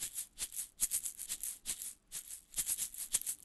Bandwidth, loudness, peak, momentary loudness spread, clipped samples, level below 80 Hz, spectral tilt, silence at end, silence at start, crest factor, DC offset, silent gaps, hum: 12.5 kHz; -38 LUFS; -16 dBFS; 9 LU; under 0.1%; -64 dBFS; 2 dB/octave; 0.05 s; 0 s; 26 dB; under 0.1%; none; none